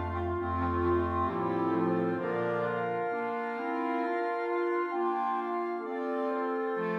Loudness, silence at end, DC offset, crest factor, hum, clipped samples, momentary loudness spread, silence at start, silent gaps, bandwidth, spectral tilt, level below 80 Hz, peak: -31 LUFS; 0 s; under 0.1%; 12 dB; none; under 0.1%; 4 LU; 0 s; none; 6 kHz; -9 dB/octave; -52 dBFS; -18 dBFS